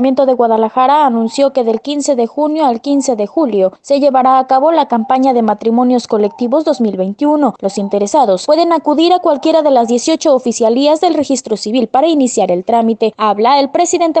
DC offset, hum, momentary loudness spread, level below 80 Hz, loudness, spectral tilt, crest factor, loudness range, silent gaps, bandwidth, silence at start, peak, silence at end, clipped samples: under 0.1%; none; 5 LU; -60 dBFS; -12 LUFS; -4.5 dB/octave; 12 dB; 2 LU; none; 9.2 kHz; 0 s; 0 dBFS; 0 s; under 0.1%